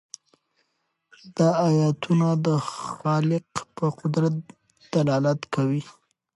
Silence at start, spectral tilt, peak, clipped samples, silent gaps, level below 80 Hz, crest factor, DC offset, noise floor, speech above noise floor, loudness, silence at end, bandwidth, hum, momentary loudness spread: 1.25 s; -7 dB/octave; -8 dBFS; under 0.1%; none; -66 dBFS; 16 dB; under 0.1%; -75 dBFS; 52 dB; -24 LUFS; 0.45 s; 11.5 kHz; none; 12 LU